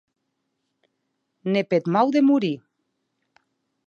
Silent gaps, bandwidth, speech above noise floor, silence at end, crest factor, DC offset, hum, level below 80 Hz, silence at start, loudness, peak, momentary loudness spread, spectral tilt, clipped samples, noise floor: none; 7 kHz; 57 dB; 1.3 s; 20 dB; under 0.1%; none; -76 dBFS; 1.45 s; -21 LUFS; -6 dBFS; 13 LU; -7.5 dB/octave; under 0.1%; -77 dBFS